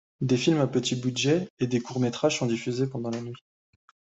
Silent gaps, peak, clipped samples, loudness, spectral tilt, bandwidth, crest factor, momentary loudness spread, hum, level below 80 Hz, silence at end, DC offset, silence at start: 1.50-1.57 s; -10 dBFS; under 0.1%; -27 LUFS; -5.5 dB/octave; 8.2 kHz; 18 dB; 9 LU; none; -66 dBFS; 0.8 s; under 0.1%; 0.2 s